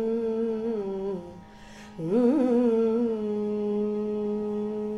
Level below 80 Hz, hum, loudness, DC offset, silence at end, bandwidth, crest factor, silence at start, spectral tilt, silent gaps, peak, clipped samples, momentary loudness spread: -58 dBFS; none; -27 LUFS; under 0.1%; 0 s; 10.5 kHz; 14 dB; 0 s; -8.5 dB/octave; none; -12 dBFS; under 0.1%; 18 LU